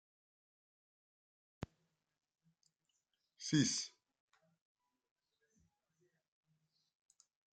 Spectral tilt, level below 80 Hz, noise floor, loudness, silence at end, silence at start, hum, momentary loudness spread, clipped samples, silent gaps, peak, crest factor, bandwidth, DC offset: -3.5 dB/octave; -78 dBFS; -87 dBFS; -37 LUFS; 3.7 s; 3.4 s; none; 19 LU; under 0.1%; none; -20 dBFS; 26 dB; 9.4 kHz; under 0.1%